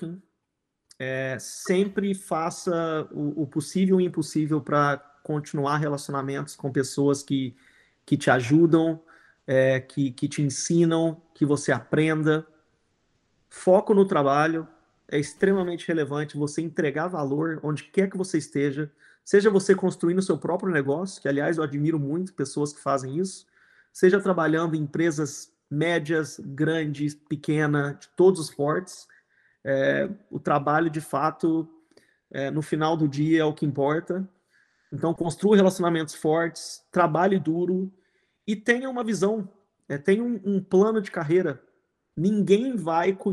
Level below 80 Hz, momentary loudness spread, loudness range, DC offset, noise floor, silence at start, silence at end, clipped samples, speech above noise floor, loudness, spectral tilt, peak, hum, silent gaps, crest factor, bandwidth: -68 dBFS; 11 LU; 3 LU; under 0.1%; -80 dBFS; 0 s; 0 s; under 0.1%; 56 dB; -25 LUFS; -6 dB/octave; -4 dBFS; none; none; 20 dB; 12.5 kHz